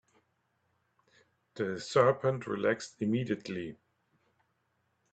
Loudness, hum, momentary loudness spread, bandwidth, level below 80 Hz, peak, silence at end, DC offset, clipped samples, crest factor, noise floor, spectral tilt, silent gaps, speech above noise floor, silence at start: -32 LUFS; none; 13 LU; 9 kHz; -74 dBFS; -10 dBFS; 1.4 s; under 0.1%; under 0.1%; 26 dB; -77 dBFS; -6 dB/octave; none; 46 dB; 1.55 s